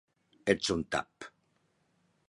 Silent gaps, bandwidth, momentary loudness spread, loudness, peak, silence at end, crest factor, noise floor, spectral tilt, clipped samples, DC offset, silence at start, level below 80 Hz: none; 11.5 kHz; 20 LU; -32 LUFS; -10 dBFS; 1 s; 26 dB; -74 dBFS; -4 dB/octave; under 0.1%; under 0.1%; 0.45 s; -60 dBFS